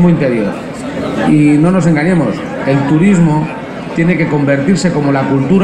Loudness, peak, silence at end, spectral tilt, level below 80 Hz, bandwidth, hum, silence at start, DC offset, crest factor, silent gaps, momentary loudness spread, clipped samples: -12 LUFS; 0 dBFS; 0 s; -7.5 dB/octave; -38 dBFS; 10 kHz; none; 0 s; under 0.1%; 10 dB; none; 11 LU; under 0.1%